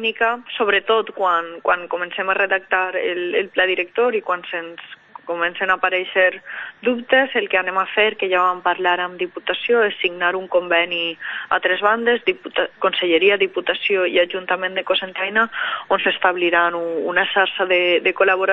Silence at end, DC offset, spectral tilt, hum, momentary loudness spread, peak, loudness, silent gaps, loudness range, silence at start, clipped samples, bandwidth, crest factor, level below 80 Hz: 0 s; under 0.1%; -5.5 dB/octave; none; 7 LU; -2 dBFS; -19 LUFS; none; 2 LU; 0 s; under 0.1%; 5.6 kHz; 18 dB; -62 dBFS